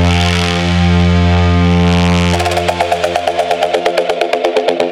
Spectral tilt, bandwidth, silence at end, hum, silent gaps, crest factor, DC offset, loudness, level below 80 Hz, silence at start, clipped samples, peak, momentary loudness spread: -6 dB/octave; 13.5 kHz; 0 s; none; none; 12 dB; under 0.1%; -12 LUFS; -32 dBFS; 0 s; under 0.1%; 0 dBFS; 4 LU